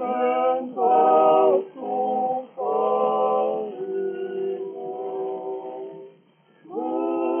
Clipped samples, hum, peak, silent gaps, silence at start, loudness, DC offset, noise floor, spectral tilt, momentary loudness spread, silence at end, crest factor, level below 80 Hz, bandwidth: under 0.1%; none; -6 dBFS; none; 0 s; -23 LUFS; under 0.1%; -58 dBFS; -4.5 dB/octave; 15 LU; 0 s; 18 dB; under -90 dBFS; 3.4 kHz